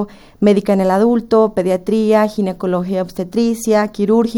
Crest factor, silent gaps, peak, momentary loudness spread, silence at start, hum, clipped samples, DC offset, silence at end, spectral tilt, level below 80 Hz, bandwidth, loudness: 14 dB; none; 0 dBFS; 7 LU; 0 s; none; under 0.1%; under 0.1%; 0 s; -6.5 dB/octave; -48 dBFS; 17 kHz; -15 LUFS